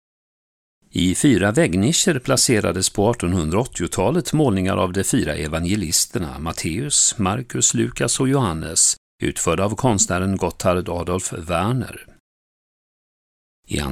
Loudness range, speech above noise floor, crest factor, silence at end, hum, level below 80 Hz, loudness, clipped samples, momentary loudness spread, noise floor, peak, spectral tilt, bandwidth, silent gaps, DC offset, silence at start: 4 LU; over 71 dB; 18 dB; 0 s; none; -40 dBFS; -19 LUFS; under 0.1%; 8 LU; under -90 dBFS; -2 dBFS; -4 dB/octave; 16 kHz; 8.97-9.18 s, 12.20-13.63 s; under 0.1%; 0.95 s